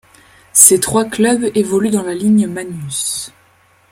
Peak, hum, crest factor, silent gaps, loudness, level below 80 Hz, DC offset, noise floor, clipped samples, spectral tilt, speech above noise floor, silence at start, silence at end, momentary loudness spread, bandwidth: 0 dBFS; none; 16 dB; none; -13 LUFS; -50 dBFS; under 0.1%; -52 dBFS; 0.3%; -3.5 dB/octave; 38 dB; 0.55 s; 0.65 s; 15 LU; 16.5 kHz